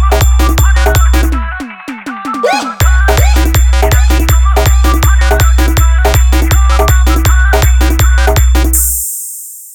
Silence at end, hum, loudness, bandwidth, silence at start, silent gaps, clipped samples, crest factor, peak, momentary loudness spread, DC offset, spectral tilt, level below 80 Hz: 0 s; none; -10 LUFS; over 20 kHz; 0 s; none; 0.2%; 8 dB; 0 dBFS; 9 LU; under 0.1%; -4.5 dB/octave; -8 dBFS